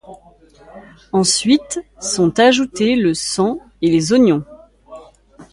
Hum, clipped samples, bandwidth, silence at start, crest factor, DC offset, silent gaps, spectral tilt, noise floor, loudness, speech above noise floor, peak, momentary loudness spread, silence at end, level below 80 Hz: none; under 0.1%; 11.5 kHz; 0.1 s; 16 dB; under 0.1%; none; -4 dB/octave; -47 dBFS; -16 LUFS; 32 dB; -2 dBFS; 9 LU; 0.1 s; -50 dBFS